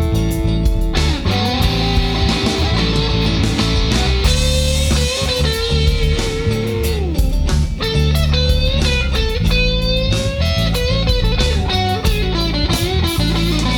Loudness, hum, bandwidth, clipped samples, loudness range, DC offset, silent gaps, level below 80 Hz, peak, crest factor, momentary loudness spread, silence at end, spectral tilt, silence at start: -16 LUFS; none; 19 kHz; under 0.1%; 1 LU; under 0.1%; none; -18 dBFS; -2 dBFS; 14 dB; 3 LU; 0 s; -5 dB/octave; 0 s